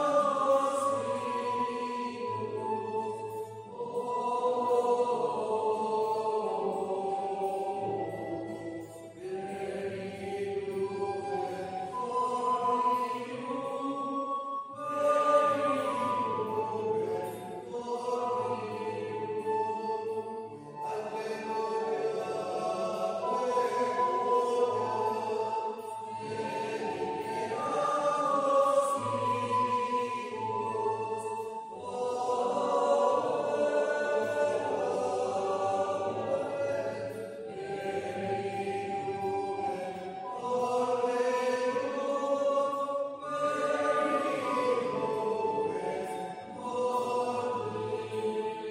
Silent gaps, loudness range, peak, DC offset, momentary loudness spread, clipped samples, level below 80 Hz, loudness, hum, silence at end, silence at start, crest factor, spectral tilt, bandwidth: none; 5 LU; -14 dBFS; under 0.1%; 10 LU; under 0.1%; -78 dBFS; -32 LUFS; none; 0 s; 0 s; 18 dB; -5 dB/octave; 16 kHz